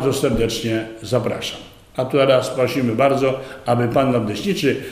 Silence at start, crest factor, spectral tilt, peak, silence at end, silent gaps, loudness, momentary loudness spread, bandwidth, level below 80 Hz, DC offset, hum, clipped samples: 0 s; 16 dB; -5.5 dB/octave; -2 dBFS; 0 s; none; -19 LUFS; 10 LU; 15.5 kHz; -42 dBFS; under 0.1%; none; under 0.1%